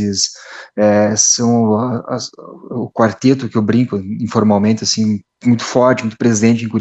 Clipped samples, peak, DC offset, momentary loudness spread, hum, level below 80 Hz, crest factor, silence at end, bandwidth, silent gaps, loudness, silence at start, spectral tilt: under 0.1%; 0 dBFS; under 0.1%; 12 LU; none; -58 dBFS; 14 dB; 0 s; 8.4 kHz; none; -14 LUFS; 0 s; -4.5 dB/octave